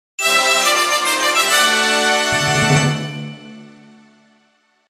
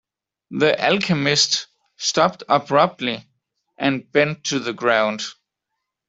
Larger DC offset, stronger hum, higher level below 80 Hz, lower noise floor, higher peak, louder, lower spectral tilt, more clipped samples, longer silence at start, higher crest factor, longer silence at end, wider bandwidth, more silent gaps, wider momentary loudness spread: neither; neither; first, -52 dBFS vs -62 dBFS; second, -59 dBFS vs -80 dBFS; about the same, -2 dBFS vs -2 dBFS; first, -14 LUFS vs -19 LUFS; about the same, -2.5 dB/octave vs -3.5 dB/octave; neither; second, 0.2 s vs 0.5 s; about the same, 16 dB vs 18 dB; first, 1.25 s vs 0.75 s; first, 15.5 kHz vs 8.2 kHz; neither; about the same, 11 LU vs 10 LU